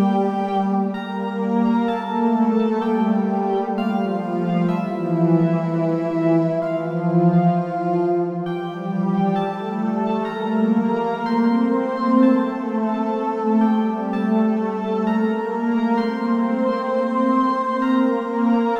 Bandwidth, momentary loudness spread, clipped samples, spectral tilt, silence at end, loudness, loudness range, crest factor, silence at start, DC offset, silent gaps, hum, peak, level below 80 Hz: 7 kHz; 5 LU; under 0.1%; -9 dB/octave; 0 s; -20 LUFS; 1 LU; 16 dB; 0 s; under 0.1%; none; none; -4 dBFS; -68 dBFS